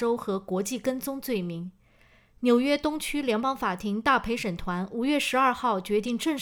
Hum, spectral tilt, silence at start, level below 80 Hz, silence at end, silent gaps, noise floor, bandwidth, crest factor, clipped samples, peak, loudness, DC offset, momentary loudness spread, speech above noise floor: none; -4.5 dB/octave; 0 s; -52 dBFS; 0 s; none; -59 dBFS; over 20 kHz; 18 dB; under 0.1%; -10 dBFS; -27 LUFS; under 0.1%; 8 LU; 33 dB